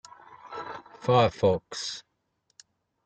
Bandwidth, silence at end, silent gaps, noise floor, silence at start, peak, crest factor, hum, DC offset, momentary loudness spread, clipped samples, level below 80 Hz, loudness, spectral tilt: 9.2 kHz; 1.05 s; none; -75 dBFS; 0.45 s; -6 dBFS; 22 dB; none; under 0.1%; 18 LU; under 0.1%; -62 dBFS; -27 LUFS; -5.5 dB/octave